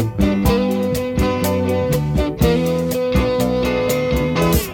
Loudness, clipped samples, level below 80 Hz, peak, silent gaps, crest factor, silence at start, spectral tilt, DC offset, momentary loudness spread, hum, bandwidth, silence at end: -18 LUFS; under 0.1%; -28 dBFS; -4 dBFS; none; 14 dB; 0 s; -6 dB/octave; under 0.1%; 3 LU; none; 19 kHz; 0 s